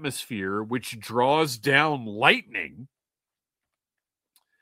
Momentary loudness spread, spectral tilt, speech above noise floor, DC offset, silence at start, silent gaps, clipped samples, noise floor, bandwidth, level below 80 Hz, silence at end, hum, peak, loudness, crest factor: 12 LU; -4 dB/octave; over 65 dB; under 0.1%; 0 s; none; under 0.1%; under -90 dBFS; 16 kHz; -70 dBFS; 1.75 s; none; -2 dBFS; -24 LUFS; 26 dB